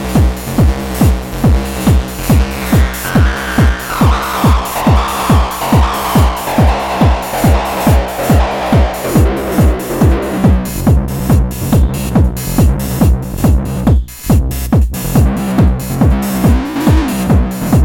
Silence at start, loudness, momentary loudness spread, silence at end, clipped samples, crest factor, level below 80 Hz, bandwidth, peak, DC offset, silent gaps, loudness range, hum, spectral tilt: 0 s; -13 LUFS; 1 LU; 0 s; under 0.1%; 10 dB; -16 dBFS; 17 kHz; -2 dBFS; under 0.1%; none; 1 LU; none; -6.5 dB/octave